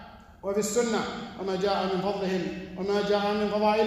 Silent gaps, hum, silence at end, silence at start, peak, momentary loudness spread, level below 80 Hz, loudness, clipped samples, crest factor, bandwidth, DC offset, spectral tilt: none; none; 0 s; 0 s; -12 dBFS; 9 LU; -56 dBFS; -28 LUFS; under 0.1%; 14 dB; 14.5 kHz; under 0.1%; -4.5 dB/octave